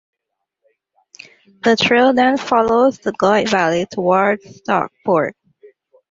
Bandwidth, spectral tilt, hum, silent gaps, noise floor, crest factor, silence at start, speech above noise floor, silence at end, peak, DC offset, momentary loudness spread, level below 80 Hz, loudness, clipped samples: 7.8 kHz; -5 dB/octave; none; none; -78 dBFS; 16 dB; 1.65 s; 62 dB; 0.8 s; -2 dBFS; under 0.1%; 7 LU; -56 dBFS; -16 LUFS; under 0.1%